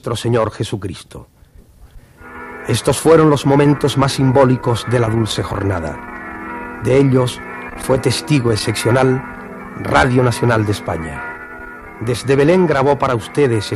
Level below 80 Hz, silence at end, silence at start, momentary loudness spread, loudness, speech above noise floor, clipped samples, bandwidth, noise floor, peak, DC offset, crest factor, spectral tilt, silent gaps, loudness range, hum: -40 dBFS; 0 s; 0.05 s; 16 LU; -15 LUFS; 29 dB; under 0.1%; 13.5 kHz; -43 dBFS; 0 dBFS; under 0.1%; 16 dB; -6 dB/octave; none; 4 LU; none